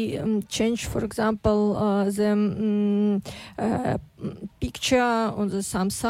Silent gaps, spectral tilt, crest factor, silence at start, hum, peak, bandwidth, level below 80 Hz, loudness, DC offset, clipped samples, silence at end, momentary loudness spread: none; -5.5 dB/octave; 14 dB; 0 s; none; -10 dBFS; 15.5 kHz; -46 dBFS; -24 LUFS; under 0.1%; under 0.1%; 0 s; 9 LU